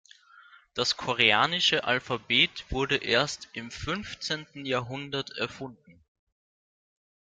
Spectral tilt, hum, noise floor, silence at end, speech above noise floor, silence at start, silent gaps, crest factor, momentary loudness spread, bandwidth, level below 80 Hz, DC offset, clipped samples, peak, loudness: -3 dB/octave; none; -56 dBFS; 1.4 s; 27 dB; 0.35 s; none; 24 dB; 14 LU; 13 kHz; -52 dBFS; under 0.1%; under 0.1%; -6 dBFS; -27 LUFS